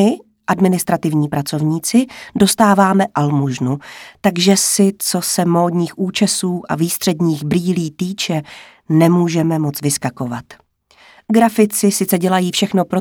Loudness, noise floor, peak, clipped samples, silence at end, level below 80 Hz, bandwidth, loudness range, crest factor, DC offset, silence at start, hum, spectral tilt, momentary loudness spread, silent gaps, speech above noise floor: -16 LUFS; -49 dBFS; 0 dBFS; under 0.1%; 0 s; -54 dBFS; 19 kHz; 3 LU; 16 dB; under 0.1%; 0 s; none; -5 dB/octave; 9 LU; none; 33 dB